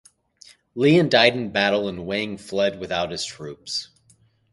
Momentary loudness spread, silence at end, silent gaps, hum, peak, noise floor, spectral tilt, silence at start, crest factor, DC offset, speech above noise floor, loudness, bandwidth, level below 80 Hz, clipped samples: 13 LU; 0.7 s; none; none; 0 dBFS; -59 dBFS; -5 dB/octave; 0.75 s; 24 dB; under 0.1%; 38 dB; -21 LUFS; 11.5 kHz; -56 dBFS; under 0.1%